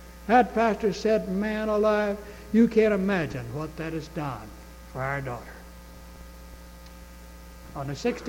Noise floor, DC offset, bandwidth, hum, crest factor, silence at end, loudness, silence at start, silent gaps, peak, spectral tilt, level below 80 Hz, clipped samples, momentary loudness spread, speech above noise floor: -45 dBFS; under 0.1%; 17 kHz; none; 20 dB; 0 s; -26 LUFS; 0 s; none; -8 dBFS; -6.5 dB/octave; -46 dBFS; under 0.1%; 25 LU; 20 dB